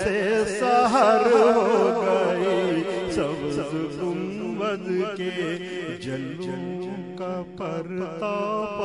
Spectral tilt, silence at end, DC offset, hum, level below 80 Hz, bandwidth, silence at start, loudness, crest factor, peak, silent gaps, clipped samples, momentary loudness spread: -5.5 dB/octave; 0 s; under 0.1%; none; -56 dBFS; 11 kHz; 0 s; -24 LUFS; 18 dB; -6 dBFS; none; under 0.1%; 14 LU